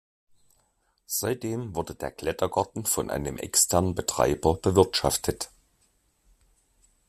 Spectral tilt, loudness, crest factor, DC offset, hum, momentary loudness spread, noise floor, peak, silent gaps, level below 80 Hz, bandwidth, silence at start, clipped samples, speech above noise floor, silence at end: -4 dB/octave; -26 LUFS; 24 dB; under 0.1%; none; 11 LU; -70 dBFS; -4 dBFS; none; -50 dBFS; 15.5 kHz; 1.1 s; under 0.1%; 44 dB; 1.6 s